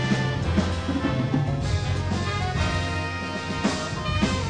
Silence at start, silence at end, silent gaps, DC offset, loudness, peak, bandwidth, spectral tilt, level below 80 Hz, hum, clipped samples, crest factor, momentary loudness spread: 0 s; 0 s; none; 0.1%; -26 LUFS; -8 dBFS; 10 kHz; -5.5 dB/octave; -36 dBFS; none; under 0.1%; 16 dB; 3 LU